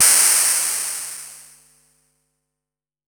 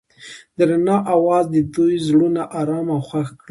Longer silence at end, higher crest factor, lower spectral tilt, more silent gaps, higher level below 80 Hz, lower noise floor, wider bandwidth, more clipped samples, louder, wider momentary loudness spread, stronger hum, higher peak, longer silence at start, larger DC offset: first, 1.65 s vs 0.15 s; first, 20 dB vs 14 dB; second, 3.5 dB/octave vs -7.5 dB/octave; neither; second, -70 dBFS vs -56 dBFS; first, -88 dBFS vs -41 dBFS; first, over 20 kHz vs 11.5 kHz; neither; first, -15 LUFS vs -18 LUFS; first, 22 LU vs 10 LU; neither; first, 0 dBFS vs -4 dBFS; second, 0 s vs 0.2 s; neither